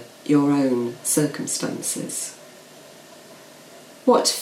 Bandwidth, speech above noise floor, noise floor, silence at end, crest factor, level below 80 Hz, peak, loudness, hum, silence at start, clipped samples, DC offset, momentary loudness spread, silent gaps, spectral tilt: 16 kHz; 24 dB; -45 dBFS; 0 s; 20 dB; -74 dBFS; -4 dBFS; -22 LUFS; none; 0 s; under 0.1%; under 0.1%; 10 LU; none; -4 dB/octave